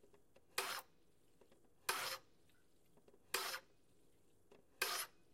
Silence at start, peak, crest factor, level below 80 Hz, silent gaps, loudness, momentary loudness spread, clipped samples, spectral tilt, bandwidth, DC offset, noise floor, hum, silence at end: 0.15 s; -24 dBFS; 26 dB; -84 dBFS; none; -44 LUFS; 7 LU; under 0.1%; 0.5 dB/octave; 16 kHz; under 0.1%; -76 dBFS; none; 0.25 s